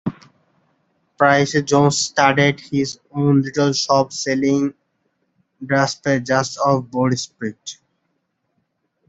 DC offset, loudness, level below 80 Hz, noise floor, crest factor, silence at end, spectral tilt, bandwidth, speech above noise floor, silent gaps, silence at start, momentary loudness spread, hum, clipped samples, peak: under 0.1%; -18 LUFS; -60 dBFS; -71 dBFS; 18 dB; 1.35 s; -5 dB/octave; 8.2 kHz; 53 dB; none; 0.05 s; 12 LU; none; under 0.1%; -2 dBFS